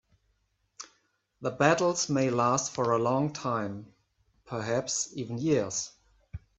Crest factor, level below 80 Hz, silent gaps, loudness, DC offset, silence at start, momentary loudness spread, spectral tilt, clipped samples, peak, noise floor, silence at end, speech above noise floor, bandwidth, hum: 24 dB; -62 dBFS; none; -29 LUFS; under 0.1%; 0.8 s; 21 LU; -4.5 dB/octave; under 0.1%; -8 dBFS; -74 dBFS; 0.2 s; 46 dB; 8.4 kHz; none